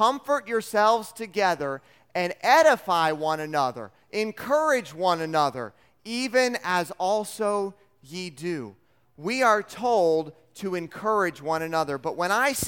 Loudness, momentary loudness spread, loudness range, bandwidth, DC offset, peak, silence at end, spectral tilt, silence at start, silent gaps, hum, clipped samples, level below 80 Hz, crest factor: -25 LUFS; 13 LU; 4 LU; 18 kHz; under 0.1%; -6 dBFS; 0 s; -3.5 dB/octave; 0 s; none; none; under 0.1%; -70 dBFS; 20 dB